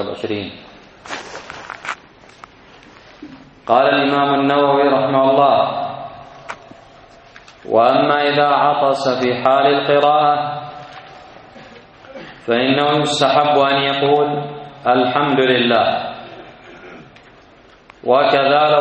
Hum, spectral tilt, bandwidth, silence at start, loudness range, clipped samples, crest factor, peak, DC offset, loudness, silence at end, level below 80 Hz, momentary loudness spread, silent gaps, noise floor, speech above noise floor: none; -5 dB/octave; 8.4 kHz; 0 s; 5 LU; under 0.1%; 16 dB; 0 dBFS; under 0.1%; -15 LUFS; 0 s; -58 dBFS; 20 LU; none; -46 dBFS; 32 dB